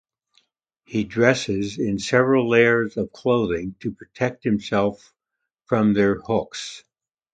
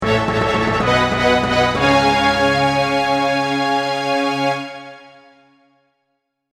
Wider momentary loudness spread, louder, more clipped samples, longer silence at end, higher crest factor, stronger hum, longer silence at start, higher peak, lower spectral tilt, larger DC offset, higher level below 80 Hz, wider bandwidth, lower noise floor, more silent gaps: first, 14 LU vs 5 LU; second, -21 LUFS vs -16 LUFS; neither; second, 0.55 s vs 1.45 s; first, 22 dB vs 16 dB; neither; first, 0.9 s vs 0 s; about the same, 0 dBFS vs -2 dBFS; about the same, -6 dB/octave vs -5 dB/octave; neither; second, -52 dBFS vs -40 dBFS; second, 9.2 kHz vs 15 kHz; first, -82 dBFS vs -72 dBFS; neither